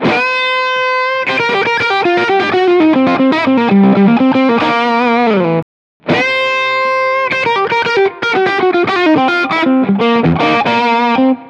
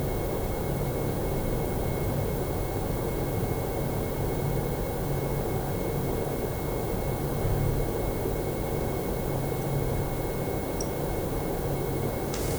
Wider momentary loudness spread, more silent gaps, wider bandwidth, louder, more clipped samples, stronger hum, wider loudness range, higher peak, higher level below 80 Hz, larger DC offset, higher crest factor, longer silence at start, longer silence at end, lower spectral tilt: first, 4 LU vs 1 LU; first, 5.62-6.00 s vs none; second, 9.4 kHz vs over 20 kHz; first, -11 LUFS vs -30 LUFS; neither; neither; about the same, 2 LU vs 1 LU; first, 0 dBFS vs -14 dBFS; second, -54 dBFS vs -36 dBFS; neither; about the same, 12 dB vs 14 dB; about the same, 0 s vs 0 s; about the same, 0 s vs 0 s; about the same, -6.5 dB/octave vs -6.5 dB/octave